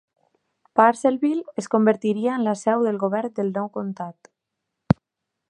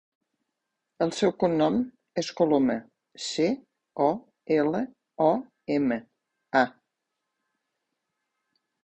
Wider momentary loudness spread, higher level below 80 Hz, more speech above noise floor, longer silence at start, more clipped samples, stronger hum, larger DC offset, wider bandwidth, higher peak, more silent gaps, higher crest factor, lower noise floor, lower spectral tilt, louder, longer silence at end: about the same, 11 LU vs 10 LU; first, -56 dBFS vs -66 dBFS; about the same, 61 dB vs 58 dB; second, 0.75 s vs 1 s; neither; neither; neither; about the same, 10.5 kHz vs 9.6 kHz; first, -2 dBFS vs -8 dBFS; neither; about the same, 22 dB vs 20 dB; about the same, -82 dBFS vs -83 dBFS; first, -7 dB/octave vs -5.5 dB/octave; first, -22 LUFS vs -27 LUFS; second, 0.55 s vs 2.15 s